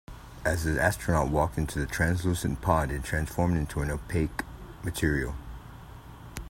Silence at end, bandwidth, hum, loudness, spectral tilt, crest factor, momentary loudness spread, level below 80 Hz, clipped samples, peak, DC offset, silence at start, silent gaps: 0 s; 16.5 kHz; none; -29 LUFS; -6 dB/octave; 22 dB; 19 LU; -40 dBFS; under 0.1%; -8 dBFS; under 0.1%; 0.1 s; none